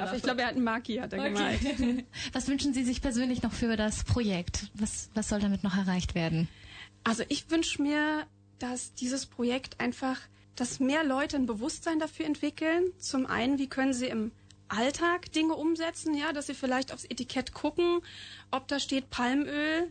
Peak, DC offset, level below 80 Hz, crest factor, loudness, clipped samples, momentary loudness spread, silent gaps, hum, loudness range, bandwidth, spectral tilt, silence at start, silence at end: -16 dBFS; under 0.1%; -50 dBFS; 14 dB; -31 LUFS; under 0.1%; 7 LU; none; 50 Hz at -55 dBFS; 2 LU; 9.4 kHz; -4.5 dB/octave; 0 s; 0 s